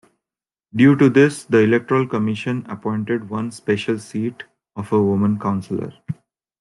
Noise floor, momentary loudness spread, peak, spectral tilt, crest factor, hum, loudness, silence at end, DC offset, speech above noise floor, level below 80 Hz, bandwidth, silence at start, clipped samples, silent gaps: under -90 dBFS; 17 LU; -2 dBFS; -7 dB/octave; 18 dB; none; -19 LUFS; 0.5 s; under 0.1%; over 72 dB; -62 dBFS; 12 kHz; 0.75 s; under 0.1%; none